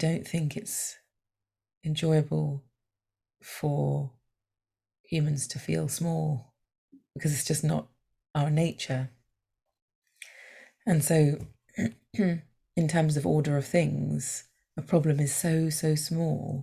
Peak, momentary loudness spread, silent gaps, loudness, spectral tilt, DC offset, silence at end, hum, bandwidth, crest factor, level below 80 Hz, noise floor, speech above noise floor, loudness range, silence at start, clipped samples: -10 dBFS; 14 LU; 1.77-1.81 s, 5.00-5.04 s, 6.78-6.88 s, 9.82-9.88 s, 9.95-10.02 s; -29 LUFS; -5.5 dB/octave; under 0.1%; 0 s; none; 15.5 kHz; 20 dB; -62 dBFS; -88 dBFS; 61 dB; 5 LU; 0 s; under 0.1%